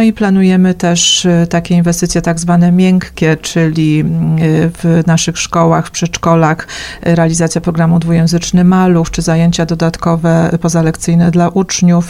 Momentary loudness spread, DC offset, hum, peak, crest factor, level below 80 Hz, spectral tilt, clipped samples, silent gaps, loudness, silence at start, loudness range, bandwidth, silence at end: 5 LU; under 0.1%; none; 0 dBFS; 10 dB; -34 dBFS; -5.5 dB/octave; under 0.1%; none; -11 LUFS; 0 s; 2 LU; 13 kHz; 0 s